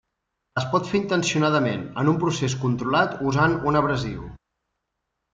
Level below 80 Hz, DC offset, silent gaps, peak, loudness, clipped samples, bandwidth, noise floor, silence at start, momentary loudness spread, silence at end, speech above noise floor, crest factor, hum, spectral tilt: -50 dBFS; under 0.1%; none; -6 dBFS; -23 LUFS; under 0.1%; 9.2 kHz; -80 dBFS; 0.55 s; 9 LU; 1 s; 58 dB; 18 dB; none; -5.5 dB/octave